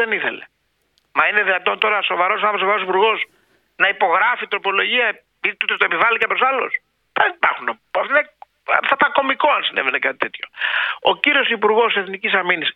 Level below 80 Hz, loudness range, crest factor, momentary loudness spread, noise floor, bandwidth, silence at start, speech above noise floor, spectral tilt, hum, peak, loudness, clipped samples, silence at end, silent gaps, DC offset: -70 dBFS; 1 LU; 18 dB; 8 LU; -65 dBFS; 5.6 kHz; 0 s; 46 dB; -5 dB/octave; none; 0 dBFS; -17 LUFS; under 0.1%; 0.05 s; none; under 0.1%